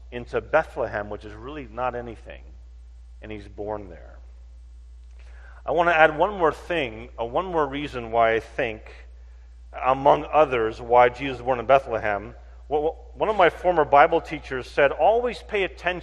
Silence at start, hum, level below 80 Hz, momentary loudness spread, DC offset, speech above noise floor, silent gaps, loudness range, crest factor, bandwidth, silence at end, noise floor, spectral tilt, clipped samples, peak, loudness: 0 s; none; -44 dBFS; 19 LU; under 0.1%; 21 dB; none; 14 LU; 24 dB; 10.5 kHz; 0 s; -44 dBFS; -6 dB/octave; under 0.1%; 0 dBFS; -23 LUFS